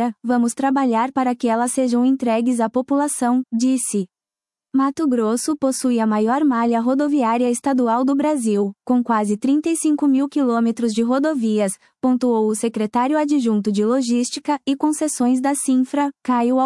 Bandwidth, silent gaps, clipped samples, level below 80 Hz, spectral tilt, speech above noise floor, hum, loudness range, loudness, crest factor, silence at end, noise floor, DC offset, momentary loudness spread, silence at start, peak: 12 kHz; none; under 0.1%; -70 dBFS; -5 dB/octave; over 72 dB; none; 2 LU; -19 LUFS; 12 dB; 0 s; under -90 dBFS; under 0.1%; 3 LU; 0 s; -6 dBFS